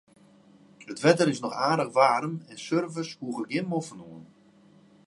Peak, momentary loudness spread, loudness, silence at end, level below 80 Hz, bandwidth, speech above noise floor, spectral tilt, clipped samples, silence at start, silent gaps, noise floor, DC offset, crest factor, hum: -4 dBFS; 18 LU; -26 LUFS; 0.8 s; -76 dBFS; 11.5 kHz; 31 dB; -5.5 dB/octave; under 0.1%; 0.8 s; none; -57 dBFS; under 0.1%; 24 dB; none